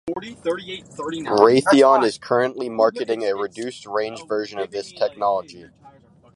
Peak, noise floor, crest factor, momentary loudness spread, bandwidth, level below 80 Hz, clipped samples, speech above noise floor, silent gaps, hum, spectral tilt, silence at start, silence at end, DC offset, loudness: 0 dBFS; -50 dBFS; 20 dB; 15 LU; 11.5 kHz; -62 dBFS; under 0.1%; 29 dB; none; none; -5 dB/octave; 0.05 s; 0.45 s; under 0.1%; -20 LUFS